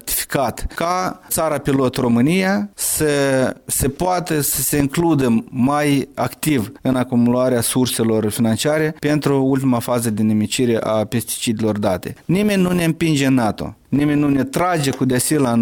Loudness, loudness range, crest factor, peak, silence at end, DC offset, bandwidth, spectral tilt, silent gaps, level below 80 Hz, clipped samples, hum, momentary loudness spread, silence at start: -18 LUFS; 1 LU; 16 dB; -2 dBFS; 0 s; under 0.1%; 19 kHz; -5 dB/octave; none; -42 dBFS; under 0.1%; none; 5 LU; 0.05 s